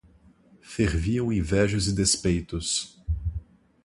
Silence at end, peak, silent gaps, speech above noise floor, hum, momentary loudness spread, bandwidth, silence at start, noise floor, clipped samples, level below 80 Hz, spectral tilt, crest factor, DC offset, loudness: 0.4 s; -8 dBFS; none; 32 dB; none; 11 LU; 11.5 kHz; 0.65 s; -57 dBFS; under 0.1%; -36 dBFS; -4.5 dB/octave; 18 dB; under 0.1%; -26 LUFS